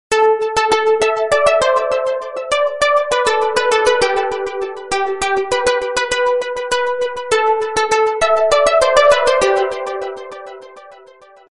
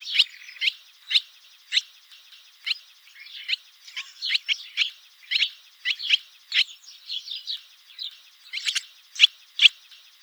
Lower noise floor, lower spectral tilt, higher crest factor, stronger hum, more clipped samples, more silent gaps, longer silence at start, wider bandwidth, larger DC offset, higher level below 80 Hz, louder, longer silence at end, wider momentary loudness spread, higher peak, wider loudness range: second, -44 dBFS vs -51 dBFS; first, -1.5 dB/octave vs 10 dB/octave; second, 16 dB vs 26 dB; neither; neither; neither; about the same, 0.1 s vs 0 s; second, 11.5 kHz vs over 20 kHz; neither; first, -46 dBFS vs under -90 dBFS; first, -15 LUFS vs -23 LUFS; about the same, 0.55 s vs 0.5 s; second, 10 LU vs 18 LU; about the same, 0 dBFS vs -2 dBFS; second, 3 LU vs 6 LU